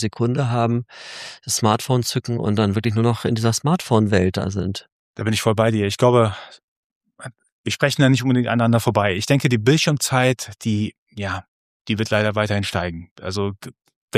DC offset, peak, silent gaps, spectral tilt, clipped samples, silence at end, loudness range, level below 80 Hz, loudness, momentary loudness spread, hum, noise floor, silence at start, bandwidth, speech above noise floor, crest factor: under 0.1%; -2 dBFS; 4.92-5.14 s, 6.63-7.01 s, 7.52-7.64 s, 10.98-11.07 s, 11.48-11.85 s, 13.11-13.16 s, 13.96-14.08 s; -5.5 dB/octave; under 0.1%; 0 s; 4 LU; -54 dBFS; -20 LUFS; 15 LU; none; -40 dBFS; 0 s; 15 kHz; 20 dB; 18 dB